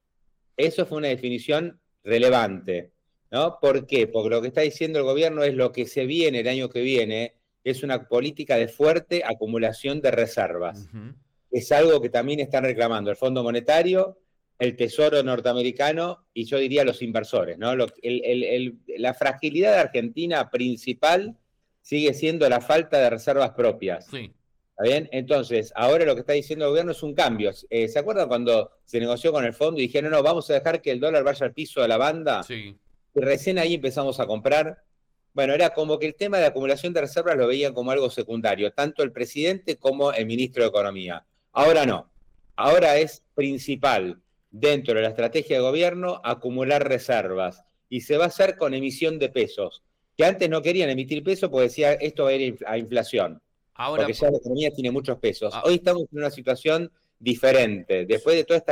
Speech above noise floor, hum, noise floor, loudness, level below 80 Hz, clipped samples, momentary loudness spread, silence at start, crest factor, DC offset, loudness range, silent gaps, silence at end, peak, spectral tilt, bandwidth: 45 dB; none; -68 dBFS; -23 LUFS; -60 dBFS; under 0.1%; 9 LU; 0.6 s; 12 dB; under 0.1%; 2 LU; none; 0 s; -12 dBFS; -5 dB/octave; 16.5 kHz